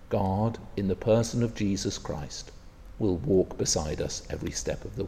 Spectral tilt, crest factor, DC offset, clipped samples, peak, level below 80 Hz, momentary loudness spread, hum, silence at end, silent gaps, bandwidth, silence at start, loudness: -5 dB/octave; 18 dB; under 0.1%; under 0.1%; -12 dBFS; -44 dBFS; 10 LU; none; 0 s; none; 15 kHz; 0 s; -29 LUFS